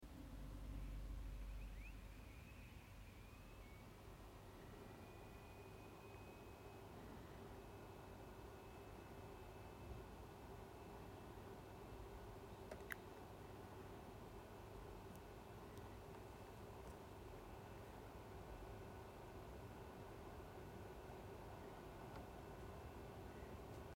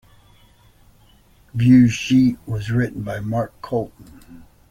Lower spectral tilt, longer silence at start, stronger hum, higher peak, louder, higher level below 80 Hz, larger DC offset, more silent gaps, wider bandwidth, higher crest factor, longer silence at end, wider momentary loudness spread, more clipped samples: about the same, -6 dB/octave vs -7 dB/octave; second, 0 s vs 1.55 s; neither; second, -30 dBFS vs -4 dBFS; second, -58 LUFS vs -19 LUFS; second, -60 dBFS vs -48 dBFS; neither; neither; first, 16.5 kHz vs 11 kHz; first, 26 dB vs 18 dB; second, 0 s vs 0.3 s; second, 5 LU vs 14 LU; neither